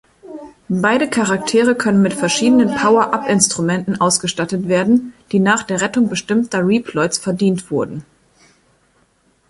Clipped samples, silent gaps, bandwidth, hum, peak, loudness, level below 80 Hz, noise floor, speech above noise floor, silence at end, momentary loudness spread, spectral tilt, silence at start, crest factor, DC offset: under 0.1%; none; 11.5 kHz; none; 0 dBFS; -16 LUFS; -54 dBFS; -58 dBFS; 43 dB; 1.45 s; 8 LU; -4.5 dB/octave; 0.25 s; 16 dB; under 0.1%